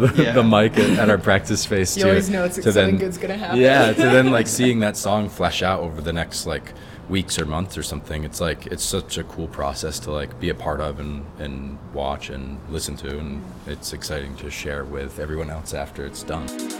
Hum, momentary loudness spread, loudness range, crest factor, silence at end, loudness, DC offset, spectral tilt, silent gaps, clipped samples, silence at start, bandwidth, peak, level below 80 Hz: none; 16 LU; 12 LU; 20 dB; 0 s; -21 LUFS; under 0.1%; -4.5 dB/octave; none; under 0.1%; 0 s; 17.5 kHz; -2 dBFS; -40 dBFS